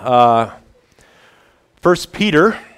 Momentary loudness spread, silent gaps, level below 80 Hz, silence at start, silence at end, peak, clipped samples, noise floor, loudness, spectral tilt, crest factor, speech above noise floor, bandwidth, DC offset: 7 LU; none; -48 dBFS; 0 s; 0.15 s; 0 dBFS; under 0.1%; -53 dBFS; -15 LUFS; -5.5 dB/octave; 16 dB; 40 dB; 15 kHz; under 0.1%